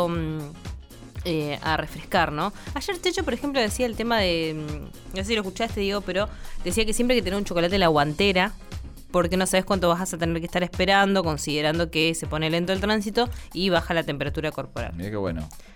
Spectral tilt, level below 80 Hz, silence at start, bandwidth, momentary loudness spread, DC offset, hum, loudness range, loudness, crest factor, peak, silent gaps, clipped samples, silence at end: -4.5 dB/octave; -38 dBFS; 0 s; 18 kHz; 12 LU; under 0.1%; none; 3 LU; -24 LUFS; 18 dB; -8 dBFS; none; under 0.1%; 0 s